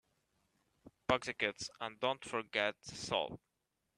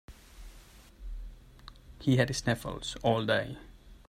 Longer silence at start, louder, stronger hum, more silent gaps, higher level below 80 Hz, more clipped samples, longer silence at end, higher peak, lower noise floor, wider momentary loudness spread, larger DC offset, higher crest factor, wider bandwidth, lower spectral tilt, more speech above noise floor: first, 0.85 s vs 0.1 s; second, -38 LUFS vs -30 LUFS; neither; neither; second, -68 dBFS vs -48 dBFS; neither; first, 0.6 s vs 0.1 s; second, -16 dBFS vs -12 dBFS; first, -85 dBFS vs -54 dBFS; second, 9 LU vs 25 LU; neither; about the same, 26 dB vs 22 dB; second, 12 kHz vs 15 kHz; second, -3 dB/octave vs -5.5 dB/octave; first, 46 dB vs 24 dB